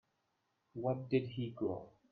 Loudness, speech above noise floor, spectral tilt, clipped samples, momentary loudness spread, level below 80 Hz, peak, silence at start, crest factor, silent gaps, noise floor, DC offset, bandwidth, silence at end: -39 LUFS; 44 dB; -10 dB/octave; under 0.1%; 10 LU; -76 dBFS; -20 dBFS; 0.75 s; 20 dB; none; -82 dBFS; under 0.1%; 4.8 kHz; 0.25 s